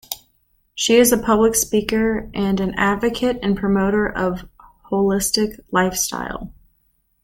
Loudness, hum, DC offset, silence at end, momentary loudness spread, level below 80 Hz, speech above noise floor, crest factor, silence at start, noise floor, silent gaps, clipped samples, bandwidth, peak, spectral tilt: -19 LUFS; none; under 0.1%; 0.75 s; 15 LU; -42 dBFS; 46 dB; 18 dB; 0.1 s; -64 dBFS; none; under 0.1%; 17 kHz; -2 dBFS; -4 dB/octave